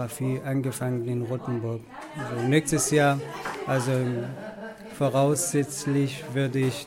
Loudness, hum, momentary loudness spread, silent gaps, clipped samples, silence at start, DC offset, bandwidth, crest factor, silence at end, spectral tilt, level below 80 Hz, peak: -26 LUFS; none; 14 LU; none; under 0.1%; 0 s; under 0.1%; 16.5 kHz; 18 dB; 0 s; -5.5 dB/octave; -60 dBFS; -8 dBFS